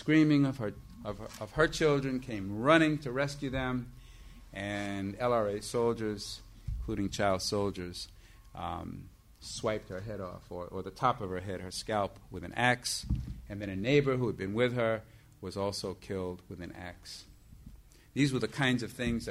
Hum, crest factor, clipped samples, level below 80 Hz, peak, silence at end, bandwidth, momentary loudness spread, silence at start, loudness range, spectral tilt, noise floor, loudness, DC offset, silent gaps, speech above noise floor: none; 22 dB; under 0.1%; -50 dBFS; -12 dBFS; 0 s; 15.5 kHz; 17 LU; 0 s; 7 LU; -5.5 dB/octave; -54 dBFS; -32 LUFS; under 0.1%; none; 22 dB